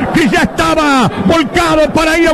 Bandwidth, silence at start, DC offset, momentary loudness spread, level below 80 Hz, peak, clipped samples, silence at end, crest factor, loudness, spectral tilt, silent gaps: 14 kHz; 0 s; under 0.1%; 1 LU; -30 dBFS; -2 dBFS; under 0.1%; 0 s; 8 dB; -10 LUFS; -5 dB/octave; none